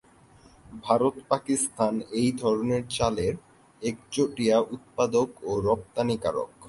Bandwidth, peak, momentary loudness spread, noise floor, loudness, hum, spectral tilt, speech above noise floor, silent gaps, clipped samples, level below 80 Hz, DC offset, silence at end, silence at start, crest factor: 11.5 kHz; -6 dBFS; 9 LU; -55 dBFS; -27 LUFS; none; -5 dB/octave; 29 dB; none; under 0.1%; -52 dBFS; under 0.1%; 0 s; 0.65 s; 20 dB